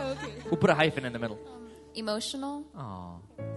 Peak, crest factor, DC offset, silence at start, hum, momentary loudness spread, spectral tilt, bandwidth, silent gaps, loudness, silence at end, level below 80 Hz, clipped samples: -8 dBFS; 24 dB; under 0.1%; 0 s; none; 19 LU; -5 dB/octave; 11.5 kHz; none; -30 LUFS; 0 s; -58 dBFS; under 0.1%